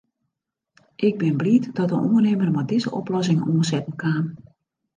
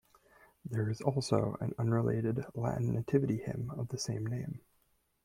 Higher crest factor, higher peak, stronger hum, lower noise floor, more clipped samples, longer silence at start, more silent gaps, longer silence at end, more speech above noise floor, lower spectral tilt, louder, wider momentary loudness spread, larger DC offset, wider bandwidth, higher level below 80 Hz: about the same, 16 dB vs 20 dB; first, -6 dBFS vs -14 dBFS; neither; first, -81 dBFS vs -74 dBFS; neither; first, 1 s vs 0.65 s; neither; about the same, 0.6 s vs 0.65 s; first, 60 dB vs 41 dB; about the same, -7 dB/octave vs -7 dB/octave; first, -22 LUFS vs -34 LUFS; second, 6 LU vs 9 LU; neither; second, 9.6 kHz vs 13.5 kHz; about the same, -66 dBFS vs -62 dBFS